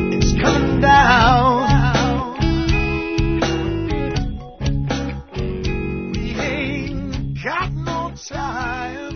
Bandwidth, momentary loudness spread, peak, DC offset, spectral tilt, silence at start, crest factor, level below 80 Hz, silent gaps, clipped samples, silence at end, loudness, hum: 6.6 kHz; 13 LU; 0 dBFS; under 0.1%; -5.5 dB/octave; 0 s; 18 dB; -26 dBFS; none; under 0.1%; 0 s; -19 LUFS; none